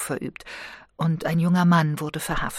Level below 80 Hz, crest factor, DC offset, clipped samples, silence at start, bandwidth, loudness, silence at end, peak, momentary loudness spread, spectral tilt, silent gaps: -44 dBFS; 16 dB; under 0.1%; under 0.1%; 0 s; 15.5 kHz; -23 LUFS; 0 s; -8 dBFS; 18 LU; -6 dB/octave; none